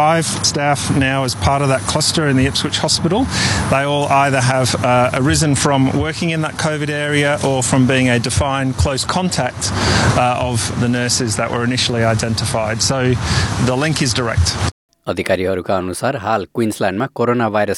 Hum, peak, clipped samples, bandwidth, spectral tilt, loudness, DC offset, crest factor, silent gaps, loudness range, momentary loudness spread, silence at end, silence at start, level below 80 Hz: none; -2 dBFS; under 0.1%; 13 kHz; -4.5 dB/octave; -16 LUFS; under 0.1%; 14 dB; 14.72-14.89 s; 3 LU; 5 LU; 0 s; 0 s; -36 dBFS